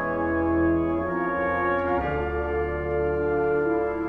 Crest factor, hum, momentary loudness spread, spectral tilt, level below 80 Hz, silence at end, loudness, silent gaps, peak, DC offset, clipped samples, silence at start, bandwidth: 12 dB; none; 4 LU; -9.5 dB/octave; -40 dBFS; 0 s; -25 LUFS; none; -12 dBFS; under 0.1%; under 0.1%; 0 s; 4.6 kHz